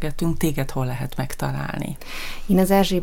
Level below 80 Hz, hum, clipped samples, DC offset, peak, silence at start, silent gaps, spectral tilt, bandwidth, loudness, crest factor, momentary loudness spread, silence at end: -32 dBFS; none; under 0.1%; under 0.1%; -2 dBFS; 0 s; none; -6 dB/octave; 17 kHz; -24 LUFS; 20 dB; 14 LU; 0 s